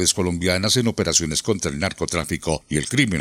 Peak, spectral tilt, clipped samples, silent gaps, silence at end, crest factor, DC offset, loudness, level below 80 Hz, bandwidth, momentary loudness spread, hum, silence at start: -2 dBFS; -3.5 dB/octave; under 0.1%; none; 0 s; 18 dB; under 0.1%; -21 LUFS; -44 dBFS; 17 kHz; 6 LU; none; 0 s